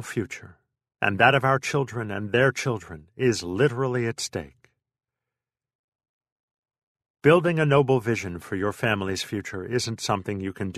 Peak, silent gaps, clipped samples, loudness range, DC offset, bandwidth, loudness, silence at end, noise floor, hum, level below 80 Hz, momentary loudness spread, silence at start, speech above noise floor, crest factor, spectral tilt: -4 dBFS; 5.75-5.99 s, 6.09-6.21 s, 6.32-6.63 s, 6.83-6.95 s, 7.10-7.14 s; under 0.1%; 7 LU; under 0.1%; 13.5 kHz; -24 LUFS; 0 s; -89 dBFS; none; -58 dBFS; 12 LU; 0 s; 65 dB; 22 dB; -5.5 dB/octave